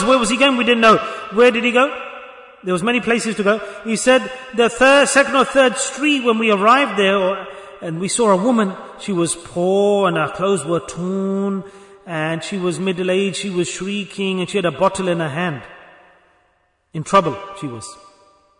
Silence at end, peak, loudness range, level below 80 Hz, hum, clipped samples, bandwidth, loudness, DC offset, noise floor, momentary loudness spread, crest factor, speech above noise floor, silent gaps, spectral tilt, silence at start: 0.65 s; -2 dBFS; 7 LU; -54 dBFS; none; under 0.1%; 11 kHz; -17 LUFS; under 0.1%; -62 dBFS; 15 LU; 16 dB; 45 dB; none; -4 dB/octave; 0 s